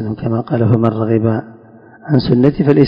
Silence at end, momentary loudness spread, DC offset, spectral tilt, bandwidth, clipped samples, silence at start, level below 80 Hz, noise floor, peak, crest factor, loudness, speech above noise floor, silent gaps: 0 s; 8 LU; under 0.1%; -10.5 dB/octave; 5.4 kHz; 0.4%; 0 s; -42 dBFS; -41 dBFS; 0 dBFS; 14 dB; -15 LUFS; 28 dB; none